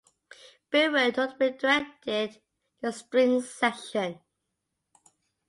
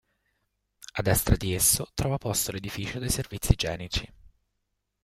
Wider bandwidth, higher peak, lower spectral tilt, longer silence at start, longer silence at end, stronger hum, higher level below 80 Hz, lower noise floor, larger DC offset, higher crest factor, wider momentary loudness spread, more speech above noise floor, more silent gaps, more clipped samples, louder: second, 11.5 kHz vs 16 kHz; second, -10 dBFS vs -6 dBFS; about the same, -3.5 dB/octave vs -3.5 dB/octave; second, 0.7 s vs 0.95 s; first, 1.35 s vs 0.75 s; second, none vs 50 Hz at -50 dBFS; second, -74 dBFS vs -38 dBFS; about the same, -82 dBFS vs -79 dBFS; neither; second, 18 dB vs 24 dB; about the same, 11 LU vs 11 LU; about the same, 55 dB vs 52 dB; neither; neither; about the same, -27 LUFS vs -27 LUFS